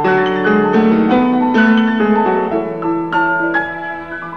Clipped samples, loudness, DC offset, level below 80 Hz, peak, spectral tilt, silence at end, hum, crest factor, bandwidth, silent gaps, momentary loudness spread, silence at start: under 0.1%; -14 LUFS; 0.5%; -48 dBFS; 0 dBFS; -8 dB/octave; 0 s; none; 12 dB; 6.2 kHz; none; 7 LU; 0 s